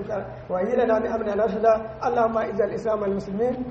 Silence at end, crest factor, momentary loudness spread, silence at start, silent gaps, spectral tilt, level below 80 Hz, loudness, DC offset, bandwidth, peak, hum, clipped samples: 0 s; 16 dB; 6 LU; 0 s; none; -7.5 dB/octave; -50 dBFS; -24 LUFS; under 0.1%; 7.6 kHz; -8 dBFS; none; under 0.1%